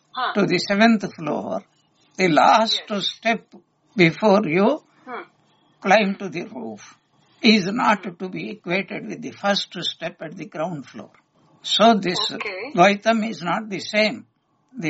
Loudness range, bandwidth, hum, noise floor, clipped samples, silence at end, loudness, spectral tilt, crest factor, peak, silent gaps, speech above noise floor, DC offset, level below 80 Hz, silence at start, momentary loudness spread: 5 LU; 8 kHz; none; -60 dBFS; under 0.1%; 0 s; -20 LUFS; -3 dB/octave; 20 dB; -2 dBFS; none; 40 dB; under 0.1%; -68 dBFS; 0.15 s; 17 LU